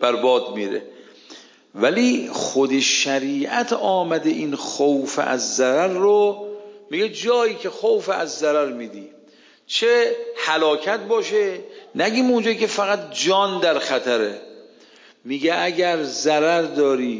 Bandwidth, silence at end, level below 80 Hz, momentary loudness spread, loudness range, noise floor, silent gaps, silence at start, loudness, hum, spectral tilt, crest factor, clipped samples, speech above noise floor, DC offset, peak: 7.6 kHz; 0 s; -78 dBFS; 9 LU; 2 LU; -52 dBFS; none; 0 s; -20 LUFS; none; -3 dB/octave; 16 dB; under 0.1%; 32 dB; under 0.1%; -4 dBFS